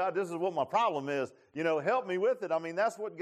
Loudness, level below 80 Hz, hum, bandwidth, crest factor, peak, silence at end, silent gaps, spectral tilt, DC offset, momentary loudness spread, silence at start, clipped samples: -32 LUFS; -84 dBFS; none; 13 kHz; 14 dB; -18 dBFS; 0 s; none; -5.5 dB/octave; under 0.1%; 6 LU; 0 s; under 0.1%